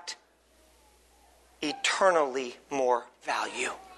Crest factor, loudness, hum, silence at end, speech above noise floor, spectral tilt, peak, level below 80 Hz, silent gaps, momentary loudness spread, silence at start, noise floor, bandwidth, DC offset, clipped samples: 22 dB; -29 LUFS; none; 0 s; 34 dB; -1.5 dB/octave; -10 dBFS; -70 dBFS; none; 12 LU; 0 s; -63 dBFS; 12 kHz; under 0.1%; under 0.1%